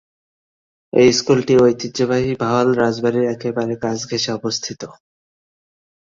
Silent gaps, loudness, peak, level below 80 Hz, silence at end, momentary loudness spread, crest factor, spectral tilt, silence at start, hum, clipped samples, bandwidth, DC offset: none; -17 LUFS; -2 dBFS; -52 dBFS; 1.1 s; 9 LU; 18 dB; -5 dB/octave; 0.95 s; none; under 0.1%; 7.6 kHz; under 0.1%